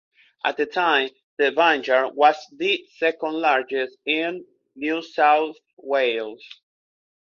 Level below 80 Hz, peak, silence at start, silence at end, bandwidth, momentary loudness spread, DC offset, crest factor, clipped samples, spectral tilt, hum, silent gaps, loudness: -76 dBFS; -2 dBFS; 0.45 s; 0.85 s; 7 kHz; 12 LU; under 0.1%; 20 dB; under 0.1%; -3.5 dB/octave; none; 1.23-1.37 s, 5.73-5.77 s; -22 LUFS